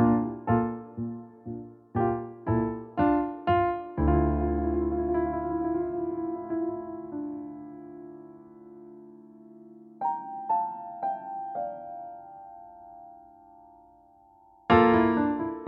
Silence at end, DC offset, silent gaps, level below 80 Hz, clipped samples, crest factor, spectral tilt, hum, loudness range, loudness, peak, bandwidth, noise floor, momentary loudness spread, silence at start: 0 s; under 0.1%; none; -42 dBFS; under 0.1%; 22 dB; -7 dB/octave; none; 12 LU; -28 LUFS; -8 dBFS; 5.2 kHz; -58 dBFS; 23 LU; 0 s